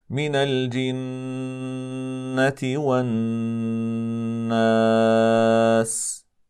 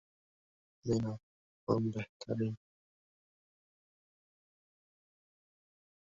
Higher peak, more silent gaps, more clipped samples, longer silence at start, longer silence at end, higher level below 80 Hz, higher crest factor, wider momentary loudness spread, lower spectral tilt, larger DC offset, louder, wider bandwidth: first, -8 dBFS vs -16 dBFS; second, none vs 1.23-1.67 s, 2.09-2.20 s; neither; second, 0.1 s vs 0.85 s; second, 0.3 s vs 3.55 s; about the same, -66 dBFS vs -68 dBFS; second, 14 dB vs 24 dB; about the same, 12 LU vs 14 LU; second, -5.5 dB/octave vs -8 dB/octave; neither; first, -22 LUFS vs -37 LUFS; first, 13.5 kHz vs 7.4 kHz